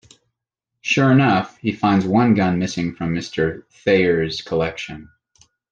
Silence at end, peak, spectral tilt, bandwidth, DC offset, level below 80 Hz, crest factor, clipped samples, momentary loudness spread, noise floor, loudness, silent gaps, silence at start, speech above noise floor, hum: 0.7 s; -4 dBFS; -6.5 dB/octave; 9 kHz; under 0.1%; -52 dBFS; 16 dB; under 0.1%; 10 LU; -82 dBFS; -19 LUFS; none; 0.85 s; 63 dB; none